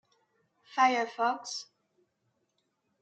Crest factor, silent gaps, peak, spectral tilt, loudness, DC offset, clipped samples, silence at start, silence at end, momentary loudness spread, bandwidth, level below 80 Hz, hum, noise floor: 22 dB; none; -12 dBFS; -1.5 dB/octave; -30 LUFS; under 0.1%; under 0.1%; 0.7 s; 1.4 s; 13 LU; 9 kHz; under -90 dBFS; none; -78 dBFS